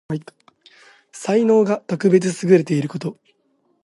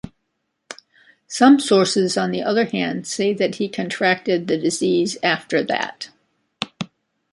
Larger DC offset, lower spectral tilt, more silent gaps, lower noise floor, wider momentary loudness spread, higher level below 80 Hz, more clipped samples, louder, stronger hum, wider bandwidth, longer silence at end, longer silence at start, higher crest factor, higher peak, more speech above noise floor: neither; first, -7 dB/octave vs -4 dB/octave; neither; second, -65 dBFS vs -74 dBFS; second, 14 LU vs 21 LU; about the same, -66 dBFS vs -62 dBFS; neither; about the same, -18 LUFS vs -19 LUFS; neither; about the same, 11.5 kHz vs 11.5 kHz; first, 0.7 s vs 0.45 s; about the same, 0.1 s vs 0.05 s; about the same, 18 dB vs 18 dB; about the same, -2 dBFS vs -2 dBFS; second, 47 dB vs 55 dB